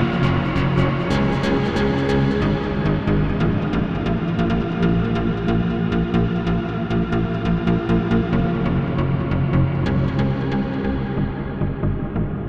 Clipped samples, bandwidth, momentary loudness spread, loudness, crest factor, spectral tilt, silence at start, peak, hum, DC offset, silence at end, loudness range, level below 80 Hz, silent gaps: under 0.1%; 7.6 kHz; 4 LU; -21 LUFS; 14 dB; -8.5 dB/octave; 0 s; -6 dBFS; none; 1%; 0 s; 1 LU; -32 dBFS; none